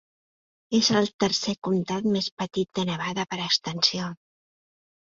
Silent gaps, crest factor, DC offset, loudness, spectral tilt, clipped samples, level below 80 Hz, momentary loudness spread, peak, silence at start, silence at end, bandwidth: 1.14-1.19 s, 1.58-1.62 s, 2.32-2.37 s; 22 dB; under 0.1%; -25 LUFS; -4 dB/octave; under 0.1%; -64 dBFS; 8 LU; -4 dBFS; 0.7 s; 0.9 s; 7.6 kHz